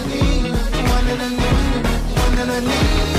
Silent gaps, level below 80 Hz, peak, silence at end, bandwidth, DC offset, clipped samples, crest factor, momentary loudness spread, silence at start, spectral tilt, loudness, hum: none; -20 dBFS; -6 dBFS; 0 s; 15.5 kHz; under 0.1%; under 0.1%; 10 dB; 3 LU; 0 s; -5 dB/octave; -19 LUFS; none